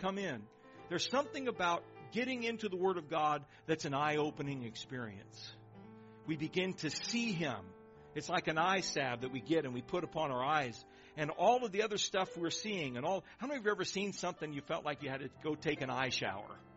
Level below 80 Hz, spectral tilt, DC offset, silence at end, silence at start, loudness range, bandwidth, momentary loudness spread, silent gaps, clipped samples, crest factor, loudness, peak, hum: -72 dBFS; -3 dB/octave; under 0.1%; 0 s; 0 s; 4 LU; 8 kHz; 14 LU; none; under 0.1%; 20 dB; -37 LUFS; -18 dBFS; none